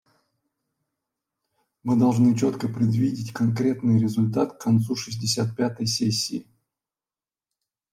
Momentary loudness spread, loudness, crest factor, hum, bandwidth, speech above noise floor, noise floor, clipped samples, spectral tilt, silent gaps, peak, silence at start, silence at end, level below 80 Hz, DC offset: 6 LU; -23 LUFS; 16 dB; none; 15 kHz; over 68 dB; under -90 dBFS; under 0.1%; -6 dB/octave; none; -8 dBFS; 1.85 s; 1.5 s; -64 dBFS; under 0.1%